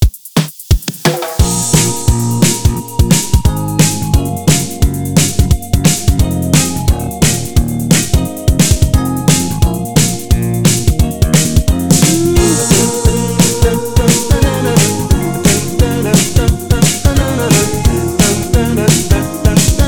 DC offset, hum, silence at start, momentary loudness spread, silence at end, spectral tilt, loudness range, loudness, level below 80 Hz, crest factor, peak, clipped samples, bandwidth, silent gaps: under 0.1%; none; 0 s; 4 LU; 0 s; -4.5 dB/octave; 2 LU; -12 LUFS; -18 dBFS; 12 dB; 0 dBFS; under 0.1%; over 20 kHz; none